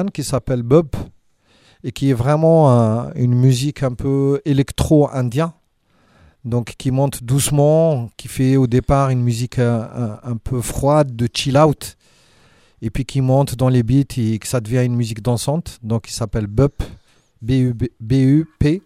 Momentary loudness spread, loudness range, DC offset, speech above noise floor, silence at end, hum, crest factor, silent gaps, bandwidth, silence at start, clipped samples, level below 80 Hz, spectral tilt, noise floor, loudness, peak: 11 LU; 4 LU; under 0.1%; 42 dB; 0.05 s; none; 16 dB; none; 15.5 kHz; 0 s; under 0.1%; -36 dBFS; -7 dB/octave; -59 dBFS; -17 LUFS; 0 dBFS